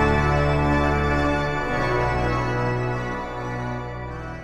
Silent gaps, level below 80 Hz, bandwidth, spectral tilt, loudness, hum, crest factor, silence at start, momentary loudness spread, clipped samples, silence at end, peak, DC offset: none; -30 dBFS; 12 kHz; -7 dB/octave; -23 LUFS; none; 16 dB; 0 s; 9 LU; under 0.1%; 0 s; -6 dBFS; under 0.1%